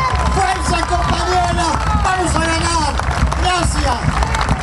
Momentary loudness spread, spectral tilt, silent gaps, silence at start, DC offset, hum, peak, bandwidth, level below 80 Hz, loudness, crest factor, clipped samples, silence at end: 2 LU; -4.5 dB/octave; none; 0 s; under 0.1%; none; 0 dBFS; 12 kHz; -20 dBFS; -16 LUFS; 14 dB; under 0.1%; 0 s